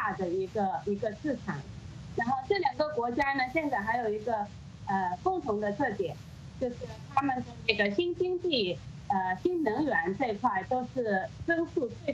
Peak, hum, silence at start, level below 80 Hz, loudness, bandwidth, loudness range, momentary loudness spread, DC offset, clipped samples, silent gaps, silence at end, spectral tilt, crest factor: -8 dBFS; none; 0 s; -56 dBFS; -31 LUFS; 8.4 kHz; 3 LU; 8 LU; under 0.1%; under 0.1%; none; 0 s; -6 dB/octave; 24 dB